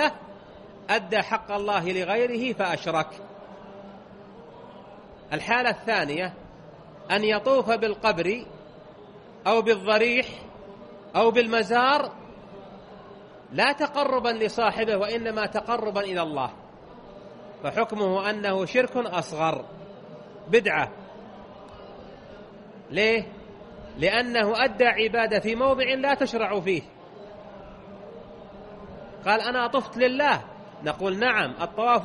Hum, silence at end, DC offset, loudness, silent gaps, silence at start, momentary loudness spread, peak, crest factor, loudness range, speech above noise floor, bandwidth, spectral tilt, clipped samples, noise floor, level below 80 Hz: none; 0 s; under 0.1%; -24 LUFS; none; 0 s; 23 LU; -6 dBFS; 20 dB; 6 LU; 22 dB; 11 kHz; -4.5 dB/octave; under 0.1%; -47 dBFS; -58 dBFS